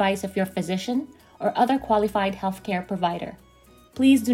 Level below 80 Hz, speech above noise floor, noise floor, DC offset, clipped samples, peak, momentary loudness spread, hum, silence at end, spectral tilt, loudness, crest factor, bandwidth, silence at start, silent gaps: -54 dBFS; 30 dB; -53 dBFS; under 0.1%; under 0.1%; -8 dBFS; 11 LU; none; 0 s; -5.5 dB/octave; -24 LUFS; 16 dB; 16 kHz; 0 s; none